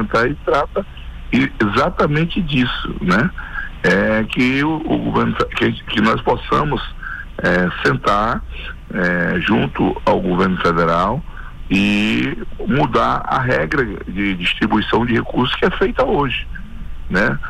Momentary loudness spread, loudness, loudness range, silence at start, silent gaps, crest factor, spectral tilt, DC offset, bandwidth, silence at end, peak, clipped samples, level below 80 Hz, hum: 11 LU; -17 LUFS; 1 LU; 0 s; none; 12 dB; -6.5 dB/octave; under 0.1%; 13 kHz; 0 s; -6 dBFS; under 0.1%; -32 dBFS; none